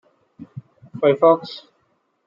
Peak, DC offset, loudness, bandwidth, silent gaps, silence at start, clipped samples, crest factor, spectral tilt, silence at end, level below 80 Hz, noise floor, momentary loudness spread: -2 dBFS; under 0.1%; -17 LUFS; 7.2 kHz; none; 0.4 s; under 0.1%; 20 dB; -8 dB/octave; 0.7 s; -68 dBFS; -67 dBFS; 25 LU